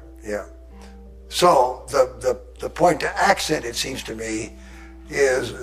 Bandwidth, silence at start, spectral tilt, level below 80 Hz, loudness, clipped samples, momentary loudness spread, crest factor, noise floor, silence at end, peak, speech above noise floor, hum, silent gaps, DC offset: 15.5 kHz; 0 s; -3.5 dB/octave; -42 dBFS; -21 LUFS; under 0.1%; 16 LU; 20 dB; -41 dBFS; 0 s; -4 dBFS; 20 dB; none; none; under 0.1%